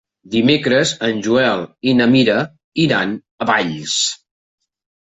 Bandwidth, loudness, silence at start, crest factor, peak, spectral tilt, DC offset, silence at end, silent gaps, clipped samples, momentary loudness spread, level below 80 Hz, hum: 8.4 kHz; -16 LUFS; 0.25 s; 14 dB; -2 dBFS; -4 dB/octave; under 0.1%; 0.9 s; 2.64-2.72 s, 3.31-3.38 s; under 0.1%; 9 LU; -54 dBFS; none